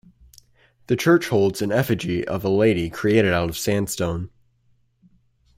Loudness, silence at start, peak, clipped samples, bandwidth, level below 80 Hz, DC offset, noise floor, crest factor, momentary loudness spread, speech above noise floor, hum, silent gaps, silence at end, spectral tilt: -21 LUFS; 0.9 s; -6 dBFS; under 0.1%; 16 kHz; -50 dBFS; under 0.1%; -62 dBFS; 18 dB; 8 LU; 42 dB; none; none; 1.3 s; -5.5 dB/octave